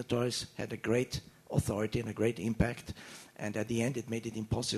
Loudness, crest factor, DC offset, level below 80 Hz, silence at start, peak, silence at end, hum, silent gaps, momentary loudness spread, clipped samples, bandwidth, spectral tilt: -35 LUFS; 20 dB; under 0.1%; -52 dBFS; 0 s; -14 dBFS; 0 s; none; none; 10 LU; under 0.1%; 13.5 kHz; -5.5 dB/octave